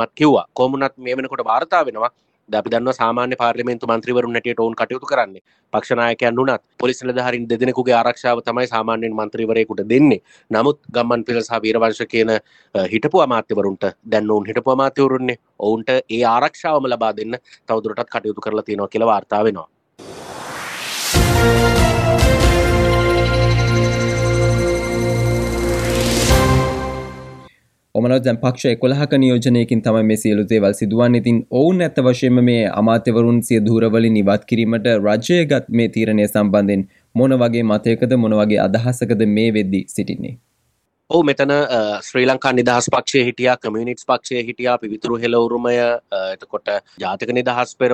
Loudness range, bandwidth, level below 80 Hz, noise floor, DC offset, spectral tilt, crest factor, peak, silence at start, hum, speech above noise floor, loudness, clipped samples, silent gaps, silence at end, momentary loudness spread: 4 LU; 15.5 kHz; -32 dBFS; -66 dBFS; under 0.1%; -6 dB/octave; 16 dB; -2 dBFS; 0 s; none; 50 dB; -17 LUFS; under 0.1%; 5.41-5.45 s; 0 s; 9 LU